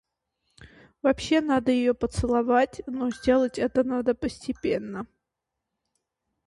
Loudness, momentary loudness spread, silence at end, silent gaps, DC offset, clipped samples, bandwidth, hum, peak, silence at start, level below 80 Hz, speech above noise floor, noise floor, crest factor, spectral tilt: -25 LUFS; 8 LU; 1.4 s; none; under 0.1%; under 0.1%; 11.5 kHz; none; -10 dBFS; 0.6 s; -48 dBFS; 60 dB; -84 dBFS; 18 dB; -6 dB/octave